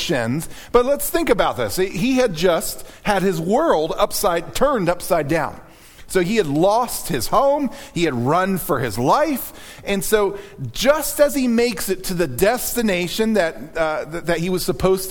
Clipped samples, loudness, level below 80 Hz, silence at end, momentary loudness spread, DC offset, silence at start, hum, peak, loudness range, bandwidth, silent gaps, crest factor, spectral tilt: under 0.1%; -19 LUFS; -38 dBFS; 0 s; 6 LU; under 0.1%; 0 s; none; -2 dBFS; 1 LU; 19 kHz; none; 18 dB; -4.5 dB/octave